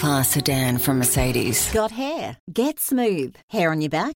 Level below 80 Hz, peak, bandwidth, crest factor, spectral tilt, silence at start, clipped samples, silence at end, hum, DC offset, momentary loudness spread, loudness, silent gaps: -40 dBFS; -6 dBFS; 17 kHz; 16 dB; -4 dB/octave; 0 s; under 0.1%; 0 s; none; under 0.1%; 9 LU; -21 LUFS; 2.40-2.47 s, 3.43-3.48 s